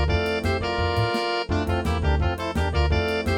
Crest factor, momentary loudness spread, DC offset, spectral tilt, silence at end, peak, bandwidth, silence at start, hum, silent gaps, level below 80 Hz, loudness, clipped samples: 14 dB; 2 LU; under 0.1%; -6.5 dB/octave; 0 s; -10 dBFS; 15 kHz; 0 s; none; none; -30 dBFS; -24 LUFS; under 0.1%